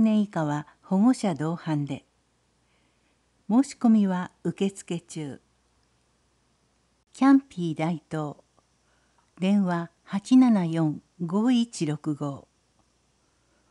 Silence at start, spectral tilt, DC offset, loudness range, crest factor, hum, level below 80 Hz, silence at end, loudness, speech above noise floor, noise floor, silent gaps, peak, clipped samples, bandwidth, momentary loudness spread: 0 s; -7 dB/octave; under 0.1%; 4 LU; 18 dB; none; -72 dBFS; 1.3 s; -25 LUFS; 44 dB; -68 dBFS; none; -10 dBFS; under 0.1%; 11 kHz; 15 LU